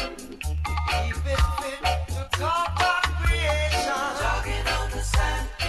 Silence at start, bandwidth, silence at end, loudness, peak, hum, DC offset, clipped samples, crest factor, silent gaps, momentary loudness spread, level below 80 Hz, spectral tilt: 0 s; 13 kHz; 0 s; -25 LUFS; -8 dBFS; none; under 0.1%; under 0.1%; 16 dB; none; 6 LU; -28 dBFS; -4 dB/octave